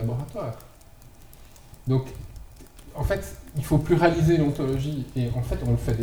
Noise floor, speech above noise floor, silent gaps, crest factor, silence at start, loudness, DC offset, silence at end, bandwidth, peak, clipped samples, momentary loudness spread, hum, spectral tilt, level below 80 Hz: -48 dBFS; 24 dB; none; 20 dB; 0 s; -25 LUFS; under 0.1%; 0 s; over 20 kHz; -6 dBFS; under 0.1%; 20 LU; none; -7.5 dB/octave; -38 dBFS